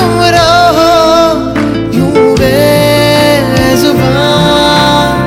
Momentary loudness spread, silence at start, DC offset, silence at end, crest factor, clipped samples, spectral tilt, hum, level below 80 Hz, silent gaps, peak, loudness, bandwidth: 4 LU; 0 s; under 0.1%; 0 s; 6 dB; 0.9%; -5 dB/octave; none; -28 dBFS; none; 0 dBFS; -7 LUFS; 17 kHz